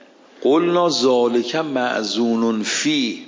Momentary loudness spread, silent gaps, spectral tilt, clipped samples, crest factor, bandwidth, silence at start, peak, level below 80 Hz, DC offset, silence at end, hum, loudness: 5 LU; none; -3.5 dB/octave; under 0.1%; 14 dB; 7.6 kHz; 0.4 s; -6 dBFS; -74 dBFS; under 0.1%; 0 s; none; -18 LUFS